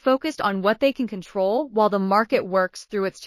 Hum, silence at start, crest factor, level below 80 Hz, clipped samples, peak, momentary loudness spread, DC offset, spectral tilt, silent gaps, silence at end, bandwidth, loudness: none; 0.05 s; 16 dB; -62 dBFS; under 0.1%; -6 dBFS; 7 LU; under 0.1%; -5.5 dB/octave; none; 0 s; 15.5 kHz; -22 LUFS